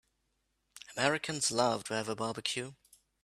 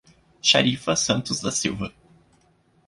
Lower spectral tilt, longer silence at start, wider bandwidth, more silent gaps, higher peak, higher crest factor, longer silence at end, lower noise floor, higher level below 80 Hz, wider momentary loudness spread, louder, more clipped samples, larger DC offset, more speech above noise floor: about the same, -2.5 dB/octave vs -3 dB/octave; first, 0.75 s vs 0.45 s; first, 14.5 kHz vs 11.5 kHz; neither; second, -12 dBFS vs -4 dBFS; about the same, 24 dB vs 22 dB; second, 0.5 s vs 0.95 s; first, -80 dBFS vs -62 dBFS; second, -72 dBFS vs -54 dBFS; about the same, 14 LU vs 12 LU; second, -33 LUFS vs -22 LUFS; neither; neither; first, 46 dB vs 39 dB